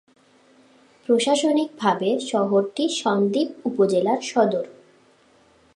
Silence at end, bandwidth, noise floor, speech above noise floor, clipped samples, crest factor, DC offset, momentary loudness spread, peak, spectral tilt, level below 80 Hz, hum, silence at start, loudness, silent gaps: 1.05 s; 11.5 kHz; -57 dBFS; 36 dB; under 0.1%; 18 dB; under 0.1%; 5 LU; -6 dBFS; -4.5 dB/octave; -76 dBFS; none; 1.1 s; -22 LUFS; none